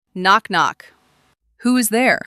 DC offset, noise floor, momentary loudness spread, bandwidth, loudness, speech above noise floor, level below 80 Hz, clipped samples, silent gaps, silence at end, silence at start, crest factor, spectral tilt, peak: under 0.1%; -61 dBFS; 6 LU; 15 kHz; -17 LUFS; 44 dB; -64 dBFS; under 0.1%; none; 0.05 s; 0.15 s; 18 dB; -3 dB/octave; -2 dBFS